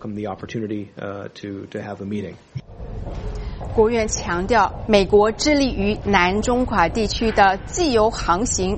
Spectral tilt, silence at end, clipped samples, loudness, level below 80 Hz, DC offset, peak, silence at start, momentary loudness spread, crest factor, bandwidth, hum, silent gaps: -4.5 dB/octave; 0 s; under 0.1%; -19 LUFS; -34 dBFS; under 0.1%; -2 dBFS; 0 s; 16 LU; 18 dB; 8.8 kHz; none; none